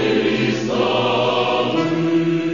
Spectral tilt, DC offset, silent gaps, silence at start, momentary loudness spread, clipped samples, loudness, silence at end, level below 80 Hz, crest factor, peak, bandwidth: -6 dB/octave; 0.4%; none; 0 s; 2 LU; under 0.1%; -18 LUFS; 0 s; -56 dBFS; 12 dB; -6 dBFS; 7.4 kHz